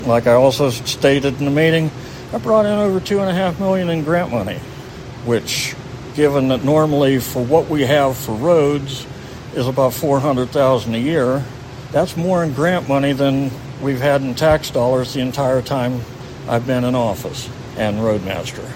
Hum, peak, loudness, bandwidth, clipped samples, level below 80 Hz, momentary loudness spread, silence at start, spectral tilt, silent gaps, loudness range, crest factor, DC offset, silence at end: none; 0 dBFS; -17 LUFS; 16.5 kHz; under 0.1%; -42 dBFS; 13 LU; 0 s; -6 dB/octave; none; 4 LU; 16 dB; under 0.1%; 0 s